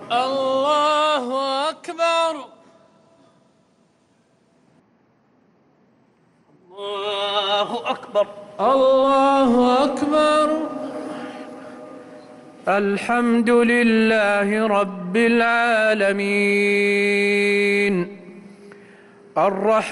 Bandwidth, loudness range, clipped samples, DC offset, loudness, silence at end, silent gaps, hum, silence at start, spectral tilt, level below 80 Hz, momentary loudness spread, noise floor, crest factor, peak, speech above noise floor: 12 kHz; 9 LU; under 0.1%; under 0.1%; -19 LUFS; 0 s; none; none; 0 s; -5 dB/octave; -60 dBFS; 15 LU; -61 dBFS; 12 dB; -8 dBFS; 42 dB